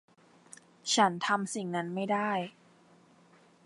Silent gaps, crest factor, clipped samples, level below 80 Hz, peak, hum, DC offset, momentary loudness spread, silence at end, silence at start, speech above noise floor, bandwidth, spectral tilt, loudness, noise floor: none; 22 dB; under 0.1%; -86 dBFS; -12 dBFS; none; under 0.1%; 10 LU; 1.15 s; 0.85 s; 31 dB; 11 kHz; -3.5 dB/octave; -30 LUFS; -61 dBFS